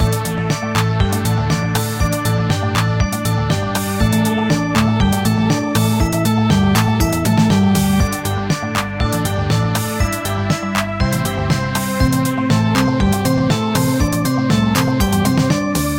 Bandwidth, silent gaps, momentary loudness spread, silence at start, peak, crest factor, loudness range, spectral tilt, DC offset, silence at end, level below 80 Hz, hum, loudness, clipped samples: 17 kHz; none; 5 LU; 0 s; 0 dBFS; 16 dB; 3 LU; -5.5 dB/octave; under 0.1%; 0 s; -28 dBFS; none; -16 LUFS; under 0.1%